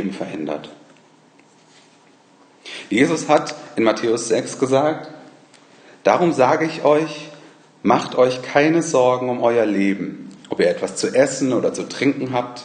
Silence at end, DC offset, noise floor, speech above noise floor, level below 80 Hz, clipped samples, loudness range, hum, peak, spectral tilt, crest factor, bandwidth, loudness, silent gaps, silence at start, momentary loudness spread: 0 s; under 0.1%; -52 dBFS; 34 dB; -66 dBFS; under 0.1%; 4 LU; none; 0 dBFS; -5 dB/octave; 20 dB; 10 kHz; -19 LUFS; none; 0 s; 12 LU